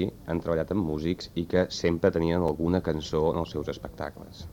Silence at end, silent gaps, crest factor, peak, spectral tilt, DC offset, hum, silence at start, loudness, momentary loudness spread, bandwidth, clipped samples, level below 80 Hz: 0 s; none; 18 dB; -8 dBFS; -6.5 dB/octave; under 0.1%; none; 0 s; -28 LUFS; 11 LU; 18 kHz; under 0.1%; -46 dBFS